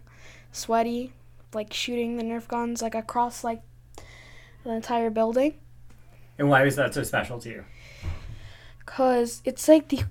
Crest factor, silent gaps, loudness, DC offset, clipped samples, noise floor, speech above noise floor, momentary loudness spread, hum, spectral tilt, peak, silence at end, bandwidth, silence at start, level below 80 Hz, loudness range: 22 dB; none; -25 LUFS; under 0.1%; under 0.1%; -49 dBFS; 24 dB; 21 LU; none; -5 dB/octave; -4 dBFS; 0 s; 18 kHz; 0 s; -48 dBFS; 5 LU